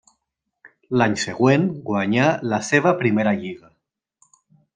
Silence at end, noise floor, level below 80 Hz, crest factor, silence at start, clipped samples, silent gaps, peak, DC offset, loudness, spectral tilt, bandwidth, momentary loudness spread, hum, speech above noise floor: 1.2 s; -78 dBFS; -62 dBFS; 18 dB; 0.65 s; under 0.1%; none; -2 dBFS; under 0.1%; -20 LUFS; -6 dB/octave; 9.8 kHz; 8 LU; none; 58 dB